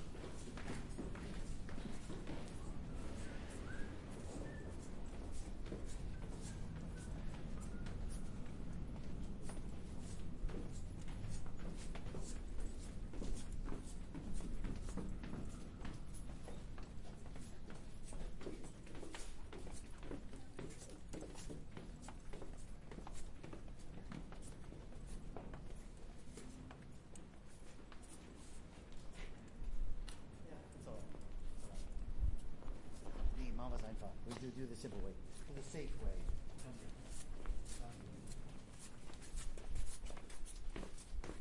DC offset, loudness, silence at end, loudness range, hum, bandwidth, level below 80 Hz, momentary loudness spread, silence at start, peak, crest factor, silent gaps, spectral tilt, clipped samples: under 0.1%; -52 LUFS; 0 s; 5 LU; none; 11.5 kHz; -48 dBFS; 7 LU; 0 s; -26 dBFS; 18 dB; none; -5.5 dB/octave; under 0.1%